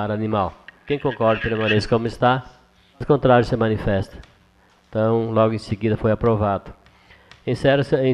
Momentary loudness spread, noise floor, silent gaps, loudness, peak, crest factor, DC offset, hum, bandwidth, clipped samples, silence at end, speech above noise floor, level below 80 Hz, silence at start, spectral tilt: 10 LU; -56 dBFS; none; -20 LUFS; -2 dBFS; 18 dB; under 0.1%; none; 10.5 kHz; under 0.1%; 0 s; 37 dB; -42 dBFS; 0 s; -7.5 dB/octave